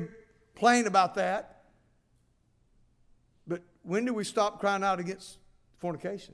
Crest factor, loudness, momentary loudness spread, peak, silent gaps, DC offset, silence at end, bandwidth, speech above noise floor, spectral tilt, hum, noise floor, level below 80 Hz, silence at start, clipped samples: 22 dB; -29 LUFS; 15 LU; -10 dBFS; none; under 0.1%; 0.05 s; 11 kHz; 40 dB; -4 dB/octave; none; -69 dBFS; -66 dBFS; 0 s; under 0.1%